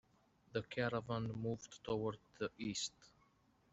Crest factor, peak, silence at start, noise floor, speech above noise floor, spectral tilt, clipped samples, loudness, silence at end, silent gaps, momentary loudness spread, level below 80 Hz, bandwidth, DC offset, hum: 20 dB; -24 dBFS; 0.55 s; -74 dBFS; 31 dB; -4.5 dB/octave; under 0.1%; -43 LUFS; 0.65 s; none; 6 LU; -70 dBFS; 8 kHz; under 0.1%; none